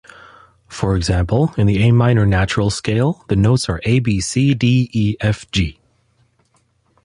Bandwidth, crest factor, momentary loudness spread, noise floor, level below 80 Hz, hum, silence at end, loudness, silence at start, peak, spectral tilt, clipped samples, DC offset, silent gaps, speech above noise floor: 11.5 kHz; 16 dB; 7 LU; -61 dBFS; -32 dBFS; none; 1.3 s; -17 LUFS; 0.7 s; -2 dBFS; -6 dB/octave; under 0.1%; under 0.1%; none; 45 dB